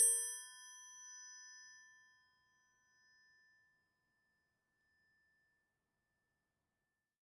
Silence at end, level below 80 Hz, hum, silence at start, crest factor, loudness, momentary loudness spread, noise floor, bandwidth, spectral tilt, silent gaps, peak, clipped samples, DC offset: 5.6 s; under -90 dBFS; none; 0 s; 28 dB; -39 LUFS; 22 LU; under -90 dBFS; 11.5 kHz; 4 dB/octave; none; -20 dBFS; under 0.1%; under 0.1%